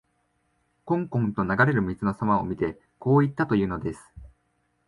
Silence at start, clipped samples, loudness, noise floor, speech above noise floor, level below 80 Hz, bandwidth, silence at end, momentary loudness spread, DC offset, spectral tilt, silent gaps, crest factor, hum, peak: 0.85 s; under 0.1%; -25 LUFS; -71 dBFS; 47 dB; -50 dBFS; 11.5 kHz; 0.6 s; 10 LU; under 0.1%; -9 dB/octave; none; 18 dB; none; -8 dBFS